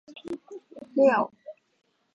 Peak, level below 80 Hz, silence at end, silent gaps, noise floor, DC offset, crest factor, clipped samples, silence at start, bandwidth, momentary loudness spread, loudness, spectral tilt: -8 dBFS; -78 dBFS; 0.65 s; none; -45 dBFS; under 0.1%; 20 dB; under 0.1%; 0.1 s; 7.4 kHz; 22 LU; -24 LUFS; -6.5 dB/octave